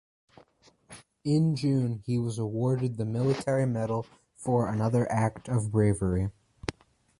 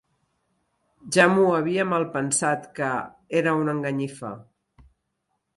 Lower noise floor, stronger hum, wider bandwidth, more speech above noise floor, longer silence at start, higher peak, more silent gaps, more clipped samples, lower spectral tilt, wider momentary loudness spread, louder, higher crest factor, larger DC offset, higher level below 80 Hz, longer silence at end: second, -61 dBFS vs -77 dBFS; neither; about the same, 11.5 kHz vs 11.5 kHz; second, 35 dB vs 54 dB; second, 0.9 s vs 1.05 s; second, -10 dBFS vs -4 dBFS; neither; neither; first, -7.5 dB/octave vs -4.5 dB/octave; about the same, 12 LU vs 13 LU; second, -29 LUFS vs -23 LUFS; about the same, 20 dB vs 22 dB; neither; first, -50 dBFS vs -64 dBFS; second, 0.5 s vs 1.15 s